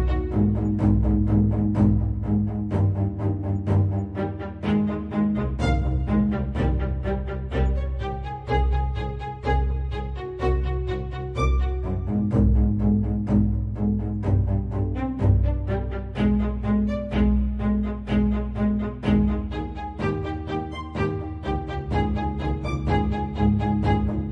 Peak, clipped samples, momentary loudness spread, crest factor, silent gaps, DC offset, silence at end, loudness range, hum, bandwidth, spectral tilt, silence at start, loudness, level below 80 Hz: -8 dBFS; under 0.1%; 8 LU; 16 dB; none; under 0.1%; 0 s; 4 LU; none; 6.2 kHz; -9 dB/octave; 0 s; -24 LUFS; -28 dBFS